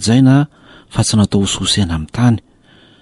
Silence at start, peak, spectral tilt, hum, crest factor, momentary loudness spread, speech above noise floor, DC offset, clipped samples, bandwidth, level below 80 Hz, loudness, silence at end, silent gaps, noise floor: 0 s; -2 dBFS; -5 dB/octave; none; 12 dB; 11 LU; 34 dB; under 0.1%; under 0.1%; 11.5 kHz; -36 dBFS; -14 LUFS; 0.65 s; none; -47 dBFS